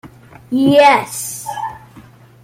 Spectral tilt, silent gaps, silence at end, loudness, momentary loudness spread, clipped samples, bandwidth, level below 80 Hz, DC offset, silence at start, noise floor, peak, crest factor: -4 dB/octave; none; 0.65 s; -14 LUFS; 16 LU; under 0.1%; 16 kHz; -54 dBFS; under 0.1%; 0.05 s; -42 dBFS; -2 dBFS; 14 dB